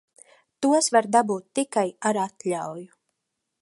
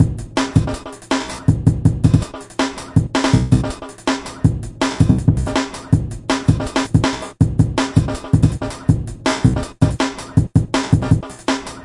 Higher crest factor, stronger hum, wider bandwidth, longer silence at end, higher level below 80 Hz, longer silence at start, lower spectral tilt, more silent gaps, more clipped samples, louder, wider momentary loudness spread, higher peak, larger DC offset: about the same, 20 dB vs 16 dB; neither; about the same, 11.5 kHz vs 11.5 kHz; first, 0.75 s vs 0 s; second, -78 dBFS vs -30 dBFS; first, 0.6 s vs 0 s; second, -3.5 dB/octave vs -6 dB/octave; neither; neither; second, -24 LUFS vs -18 LUFS; first, 11 LU vs 6 LU; second, -4 dBFS vs 0 dBFS; neither